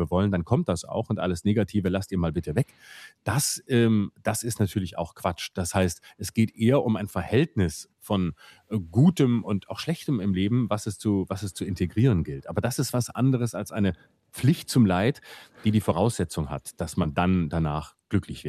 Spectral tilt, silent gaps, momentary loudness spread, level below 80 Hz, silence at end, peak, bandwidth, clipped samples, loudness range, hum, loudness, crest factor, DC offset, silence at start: -6 dB/octave; none; 10 LU; -52 dBFS; 0 s; -8 dBFS; 14.5 kHz; under 0.1%; 2 LU; none; -26 LUFS; 16 dB; under 0.1%; 0 s